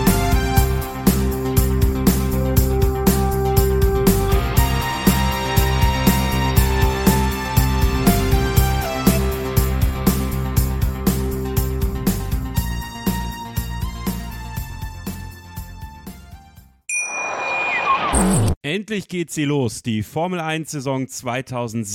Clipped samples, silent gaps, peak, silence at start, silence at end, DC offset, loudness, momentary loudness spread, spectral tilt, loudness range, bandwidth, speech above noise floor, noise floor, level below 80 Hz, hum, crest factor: under 0.1%; 18.57-18.61 s; 0 dBFS; 0 s; 0 s; under 0.1%; -20 LUFS; 10 LU; -5.5 dB/octave; 10 LU; 17 kHz; 23 dB; -46 dBFS; -24 dBFS; none; 18 dB